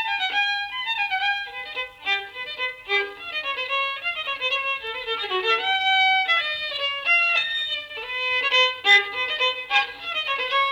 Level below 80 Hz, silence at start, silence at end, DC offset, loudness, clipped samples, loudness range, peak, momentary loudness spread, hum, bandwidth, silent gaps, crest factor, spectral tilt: -64 dBFS; 0 s; 0 s; under 0.1%; -22 LUFS; under 0.1%; 6 LU; -4 dBFS; 10 LU; none; 19.5 kHz; none; 20 dB; -0.5 dB/octave